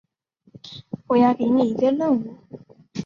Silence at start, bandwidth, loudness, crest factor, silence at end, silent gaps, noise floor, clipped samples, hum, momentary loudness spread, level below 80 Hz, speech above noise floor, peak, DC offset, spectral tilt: 0.65 s; 7 kHz; -20 LUFS; 16 dB; 0 s; none; -62 dBFS; under 0.1%; none; 19 LU; -64 dBFS; 42 dB; -6 dBFS; under 0.1%; -7.5 dB/octave